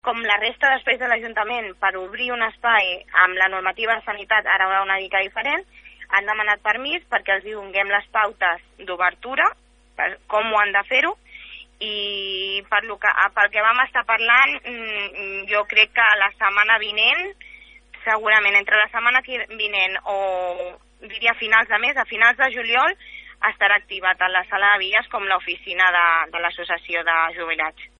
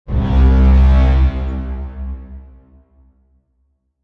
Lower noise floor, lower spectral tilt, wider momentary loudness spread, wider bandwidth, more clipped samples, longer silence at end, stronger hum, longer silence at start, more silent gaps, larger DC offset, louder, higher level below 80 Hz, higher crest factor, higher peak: second, -45 dBFS vs -64 dBFS; second, -2 dB/octave vs -9.5 dB/octave; second, 10 LU vs 18 LU; first, 7.8 kHz vs 4.4 kHz; neither; second, 0.15 s vs 1.6 s; neither; about the same, 0.05 s vs 0.1 s; neither; neither; second, -19 LUFS vs -14 LUFS; second, -56 dBFS vs -16 dBFS; first, 20 dB vs 12 dB; about the same, 0 dBFS vs -2 dBFS